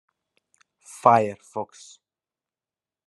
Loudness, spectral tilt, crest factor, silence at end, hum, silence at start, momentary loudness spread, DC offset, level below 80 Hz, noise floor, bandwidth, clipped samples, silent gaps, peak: -22 LUFS; -6 dB/octave; 26 dB; 1.4 s; none; 0.95 s; 20 LU; under 0.1%; -76 dBFS; under -90 dBFS; 12 kHz; under 0.1%; none; -2 dBFS